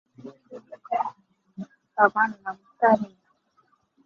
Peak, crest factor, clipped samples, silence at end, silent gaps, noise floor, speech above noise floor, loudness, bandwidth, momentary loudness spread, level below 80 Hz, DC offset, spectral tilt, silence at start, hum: -4 dBFS; 24 dB; under 0.1%; 1 s; none; -66 dBFS; 44 dB; -24 LUFS; 7 kHz; 25 LU; -74 dBFS; under 0.1%; -7.5 dB/octave; 0.25 s; none